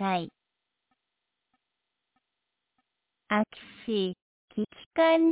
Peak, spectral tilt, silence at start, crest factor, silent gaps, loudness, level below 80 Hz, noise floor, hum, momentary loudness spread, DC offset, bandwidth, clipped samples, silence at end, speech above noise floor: -14 dBFS; -4 dB/octave; 0 s; 18 dB; 4.22-4.48 s, 4.86-4.91 s; -29 LUFS; -72 dBFS; -84 dBFS; none; 17 LU; under 0.1%; 4 kHz; under 0.1%; 0 s; 57 dB